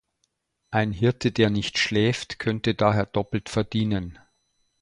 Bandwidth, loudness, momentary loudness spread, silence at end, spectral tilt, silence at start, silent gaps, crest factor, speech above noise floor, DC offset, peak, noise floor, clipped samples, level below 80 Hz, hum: 11 kHz; -24 LUFS; 6 LU; 0.7 s; -6 dB/octave; 0.7 s; none; 20 dB; 51 dB; under 0.1%; -4 dBFS; -74 dBFS; under 0.1%; -50 dBFS; none